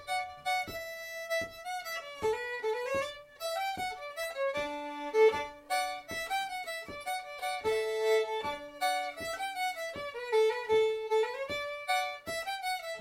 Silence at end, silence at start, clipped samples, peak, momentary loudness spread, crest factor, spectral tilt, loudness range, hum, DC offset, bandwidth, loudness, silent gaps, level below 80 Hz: 0 s; 0 s; under 0.1%; -14 dBFS; 10 LU; 20 dB; -2 dB/octave; 3 LU; none; under 0.1%; 17 kHz; -33 LUFS; none; -66 dBFS